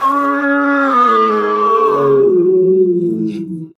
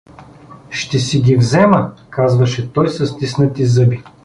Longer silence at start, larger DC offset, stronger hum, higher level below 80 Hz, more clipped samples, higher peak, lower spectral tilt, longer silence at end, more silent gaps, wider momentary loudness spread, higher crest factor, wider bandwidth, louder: second, 0 s vs 0.2 s; neither; neither; second, -68 dBFS vs -46 dBFS; neither; about the same, -2 dBFS vs -2 dBFS; about the same, -7.5 dB/octave vs -6.5 dB/octave; about the same, 0.1 s vs 0.15 s; neither; about the same, 6 LU vs 8 LU; about the same, 10 dB vs 14 dB; second, 7.6 kHz vs 10.5 kHz; first, -12 LUFS vs -15 LUFS